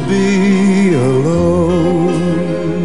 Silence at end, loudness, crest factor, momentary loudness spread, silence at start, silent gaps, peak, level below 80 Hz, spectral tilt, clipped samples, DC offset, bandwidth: 0 s; -13 LUFS; 10 dB; 4 LU; 0 s; none; -2 dBFS; -38 dBFS; -7 dB/octave; under 0.1%; 3%; 11 kHz